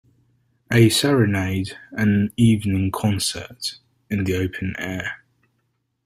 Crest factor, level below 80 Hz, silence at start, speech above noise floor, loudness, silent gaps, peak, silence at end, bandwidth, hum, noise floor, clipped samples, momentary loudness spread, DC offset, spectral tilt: 20 dB; -50 dBFS; 0.7 s; 51 dB; -21 LUFS; none; -2 dBFS; 0.9 s; 16 kHz; none; -71 dBFS; under 0.1%; 13 LU; under 0.1%; -5.5 dB/octave